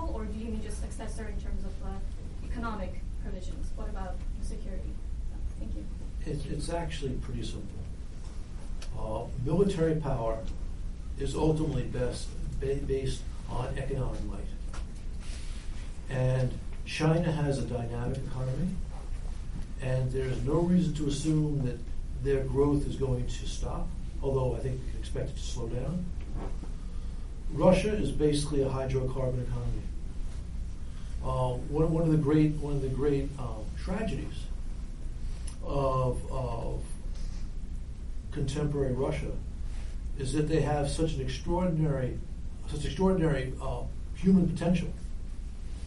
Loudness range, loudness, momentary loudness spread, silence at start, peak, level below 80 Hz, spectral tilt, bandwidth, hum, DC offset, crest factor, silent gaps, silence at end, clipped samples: 8 LU; -33 LUFS; 15 LU; 0 s; -10 dBFS; -36 dBFS; -7 dB/octave; 11.5 kHz; none; 0.4%; 20 dB; none; 0 s; under 0.1%